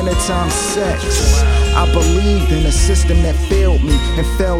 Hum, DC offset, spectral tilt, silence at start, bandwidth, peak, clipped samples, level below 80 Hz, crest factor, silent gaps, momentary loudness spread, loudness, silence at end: none; under 0.1%; -5 dB/octave; 0 s; 14.5 kHz; 0 dBFS; under 0.1%; -14 dBFS; 12 dB; none; 3 LU; -15 LUFS; 0 s